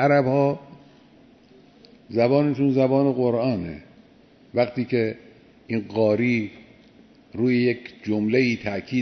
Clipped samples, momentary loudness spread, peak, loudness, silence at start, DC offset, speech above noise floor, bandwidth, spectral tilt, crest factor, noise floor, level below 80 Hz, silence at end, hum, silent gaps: under 0.1%; 11 LU; -6 dBFS; -23 LUFS; 0 s; under 0.1%; 32 dB; 6.4 kHz; -8 dB/octave; 16 dB; -53 dBFS; -60 dBFS; 0 s; none; none